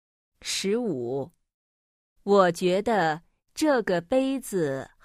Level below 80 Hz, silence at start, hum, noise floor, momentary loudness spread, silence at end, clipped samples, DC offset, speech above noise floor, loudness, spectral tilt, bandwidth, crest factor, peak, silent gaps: -62 dBFS; 0.45 s; none; under -90 dBFS; 15 LU; 0.15 s; under 0.1%; under 0.1%; over 65 dB; -25 LUFS; -4.5 dB/octave; 15.5 kHz; 20 dB; -8 dBFS; 1.54-2.16 s